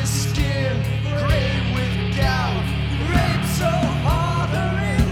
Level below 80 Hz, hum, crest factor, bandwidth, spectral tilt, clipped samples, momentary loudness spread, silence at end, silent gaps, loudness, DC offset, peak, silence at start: -28 dBFS; none; 16 dB; 17 kHz; -5.5 dB/octave; under 0.1%; 3 LU; 0 s; none; -21 LUFS; under 0.1%; -4 dBFS; 0 s